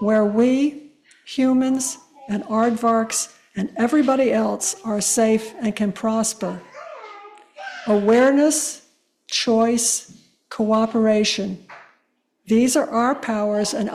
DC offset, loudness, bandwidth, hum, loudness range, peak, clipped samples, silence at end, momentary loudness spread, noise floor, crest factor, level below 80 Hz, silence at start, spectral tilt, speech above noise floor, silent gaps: under 0.1%; -20 LUFS; 14.5 kHz; none; 3 LU; -6 dBFS; under 0.1%; 0 s; 14 LU; -68 dBFS; 14 dB; -62 dBFS; 0 s; -3.5 dB/octave; 49 dB; none